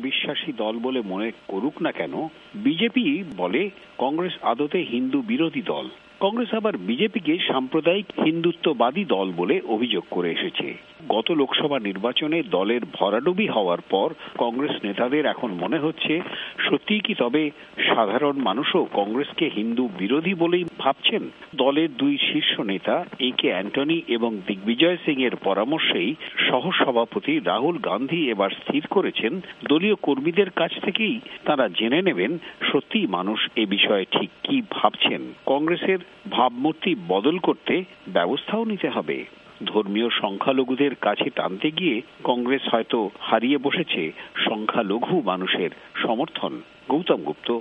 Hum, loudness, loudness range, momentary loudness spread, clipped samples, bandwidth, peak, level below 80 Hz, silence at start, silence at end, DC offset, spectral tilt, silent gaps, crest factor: none; -23 LUFS; 2 LU; 6 LU; under 0.1%; 5 kHz; -2 dBFS; -70 dBFS; 0 s; 0 s; under 0.1%; -7.5 dB/octave; none; 22 dB